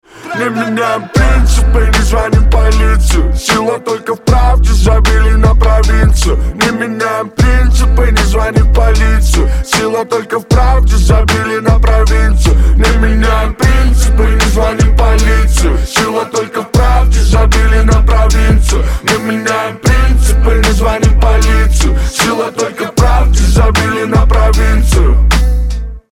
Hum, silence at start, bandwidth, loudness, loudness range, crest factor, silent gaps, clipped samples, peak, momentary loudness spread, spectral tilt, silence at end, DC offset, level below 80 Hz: none; 0.15 s; 13.5 kHz; -11 LUFS; 1 LU; 8 dB; none; under 0.1%; 0 dBFS; 5 LU; -5 dB/octave; 0.1 s; under 0.1%; -10 dBFS